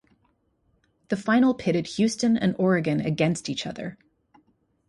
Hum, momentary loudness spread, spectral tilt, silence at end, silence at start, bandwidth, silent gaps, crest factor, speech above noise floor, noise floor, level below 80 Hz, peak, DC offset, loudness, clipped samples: none; 11 LU; -6 dB/octave; 0.95 s; 1.1 s; 11.5 kHz; none; 18 dB; 45 dB; -69 dBFS; -62 dBFS; -8 dBFS; under 0.1%; -24 LUFS; under 0.1%